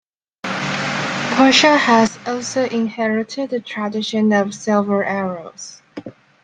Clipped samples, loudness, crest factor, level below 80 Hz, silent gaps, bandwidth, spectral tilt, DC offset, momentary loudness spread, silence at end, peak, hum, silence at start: under 0.1%; -17 LUFS; 18 dB; -60 dBFS; none; 9.4 kHz; -4 dB/octave; under 0.1%; 19 LU; 0.35 s; 0 dBFS; none; 0.45 s